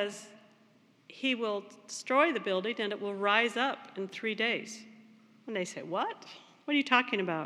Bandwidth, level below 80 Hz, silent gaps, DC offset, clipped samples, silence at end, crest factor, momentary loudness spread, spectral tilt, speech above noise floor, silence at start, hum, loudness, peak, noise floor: 13 kHz; under -90 dBFS; none; under 0.1%; under 0.1%; 0 s; 24 dB; 18 LU; -3.5 dB/octave; 32 dB; 0 s; none; -31 LUFS; -10 dBFS; -64 dBFS